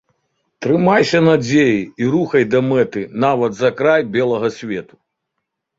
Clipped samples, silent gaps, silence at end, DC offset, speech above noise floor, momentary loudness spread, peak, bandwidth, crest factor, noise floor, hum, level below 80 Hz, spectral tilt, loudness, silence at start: under 0.1%; none; 0.95 s; under 0.1%; 61 dB; 8 LU; 0 dBFS; 7.8 kHz; 16 dB; -76 dBFS; none; -56 dBFS; -6.5 dB/octave; -16 LUFS; 0.6 s